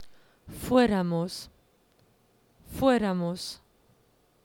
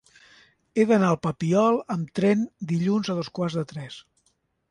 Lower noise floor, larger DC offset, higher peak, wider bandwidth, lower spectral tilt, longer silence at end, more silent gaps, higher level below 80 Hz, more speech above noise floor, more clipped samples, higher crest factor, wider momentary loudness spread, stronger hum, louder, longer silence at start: second, -65 dBFS vs -70 dBFS; neither; about the same, -10 dBFS vs -8 dBFS; first, 18 kHz vs 10.5 kHz; about the same, -6 dB/octave vs -7 dB/octave; first, 0.9 s vs 0.7 s; neither; first, -54 dBFS vs -62 dBFS; second, 40 dB vs 47 dB; neither; about the same, 20 dB vs 16 dB; first, 22 LU vs 12 LU; neither; second, -27 LUFS vs -24 LUFS; second, 0 s vs 0.75 s